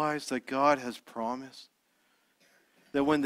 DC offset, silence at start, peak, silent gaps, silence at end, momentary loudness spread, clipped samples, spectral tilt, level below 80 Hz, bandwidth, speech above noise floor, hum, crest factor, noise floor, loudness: under 0.1%; 0 s; -10 dBFS; none; 0 s; 15 LU; under 0.1%; -5 dB/octave; -68 dBFS; 15 kHz; 41 dB; none; 22 dB; -71 dBFS; -31 LUFS